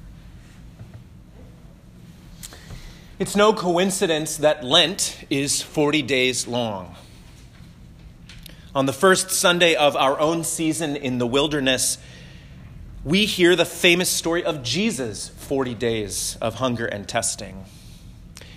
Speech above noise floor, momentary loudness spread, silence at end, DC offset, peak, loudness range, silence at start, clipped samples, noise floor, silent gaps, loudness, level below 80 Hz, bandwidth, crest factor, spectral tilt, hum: 24 dB; 21 LU; 0 s; under 0.1%; -2 dBFS; 6 LU; 0.05 s; under 0.1%; -45 dBFS; none; -20 LUFS; -48 dBFS; 16 kHz; 20 dB; -3 dB/octave; none